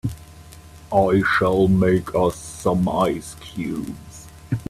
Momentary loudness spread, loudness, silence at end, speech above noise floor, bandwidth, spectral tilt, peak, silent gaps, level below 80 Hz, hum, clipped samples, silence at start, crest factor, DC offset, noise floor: 17 LU; -20 LUFS; 0.05 s; 23 dB; 14 kHz; -6.5 dB/octave; -4 dBFS; none; -44 dBFS; none; under 0.1%; 0.05 s; 18 dB; under 0.1%; -43 dBFS